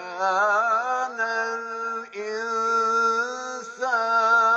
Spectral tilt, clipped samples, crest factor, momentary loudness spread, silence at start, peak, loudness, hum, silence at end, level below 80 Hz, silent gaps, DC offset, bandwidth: -1.5 dB/octave; under 0.1%; 14 dB; 10 LU; 0 s; -10 dBFS; -23 LUFS; none; 0 s; -80 dBFS; none; under 0.1%; 8 kHz